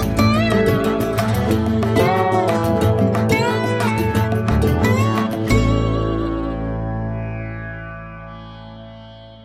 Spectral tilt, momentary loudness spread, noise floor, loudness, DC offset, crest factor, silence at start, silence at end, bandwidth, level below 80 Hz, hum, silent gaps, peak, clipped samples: -7 dB/octave; 18 LU; -39 dBFS; -18 LUFS; under 0.1%; 16 dB; 0 s; 0 s; 16 kHz; -30 dBFS; none; none; -4 dBFS; under 0.1%